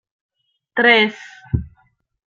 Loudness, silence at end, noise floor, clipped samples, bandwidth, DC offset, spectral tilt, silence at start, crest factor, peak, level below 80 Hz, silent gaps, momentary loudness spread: -17 LUFS; 0.65 s; -58 dBFS; under 0.1%; 7.4 kHz; under 0.1%; -6 dB/octave; 0.75 s; 20 dB; -2 dBFS; -40 dBFS; none; 14 LU